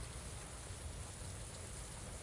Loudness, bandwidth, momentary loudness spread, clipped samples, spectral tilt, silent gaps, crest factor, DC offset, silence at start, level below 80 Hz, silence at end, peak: -48 LUFS; 11.5 kHz; 1 LU; under 0.1%; -3.5 dB/octave; none; 12 dB; under 0.1%; 0 s; -54 dBFS; 0 s; -36 dBFS